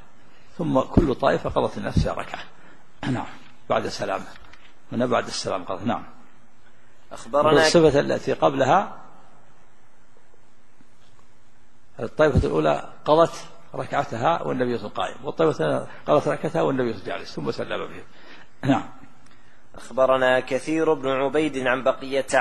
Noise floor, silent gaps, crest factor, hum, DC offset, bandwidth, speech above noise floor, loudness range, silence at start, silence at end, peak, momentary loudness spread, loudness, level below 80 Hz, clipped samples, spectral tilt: -58 dBFS; none; 24 dB; none; 2%; 12.5 kHz; 36 dB; 8 LU; 0.6 s; 0 s; 0 dBFS; 14 LU; -23 LUFS; -42 dBFS; under 0.1%; -5.5 dB/octave